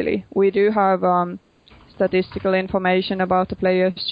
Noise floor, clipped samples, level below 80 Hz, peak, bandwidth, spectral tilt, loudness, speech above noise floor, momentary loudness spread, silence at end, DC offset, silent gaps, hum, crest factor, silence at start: -50 dBFS; under 0.1%; -50 dBFS; -6 dBFS; 5.2 kHz; -9 dB/octave; -20 LUFS; 31 dB; 5 LU; 0 s; under 0.1%; none; none; 14 dB; 0 s